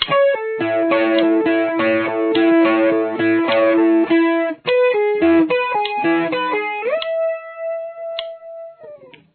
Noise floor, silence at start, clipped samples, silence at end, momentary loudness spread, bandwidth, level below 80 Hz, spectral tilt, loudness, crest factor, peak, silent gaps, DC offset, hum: -40 dBFS; 0 s; under 0.1%; 0.4 s; 13 LU; 4.5 kHz; -62 dBFS; -8.5 dB/octave; -17 LUFS; 16 dB; -2 dBFS; none; under 0.1%; none